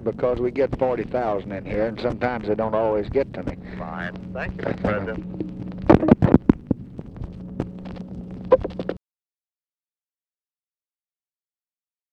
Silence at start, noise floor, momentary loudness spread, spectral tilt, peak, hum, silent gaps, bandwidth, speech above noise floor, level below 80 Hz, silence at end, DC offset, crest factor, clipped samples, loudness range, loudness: 0 s; under -90 dBFS; 18 LU; -9.5 dB/octave; 0 dBFS; none; none; 7 kHz; over 67 dB; -40 dBFS; 3.15 s; under 0.1%; 24 dB; under 0.1%; 8 LU; -23 LUFS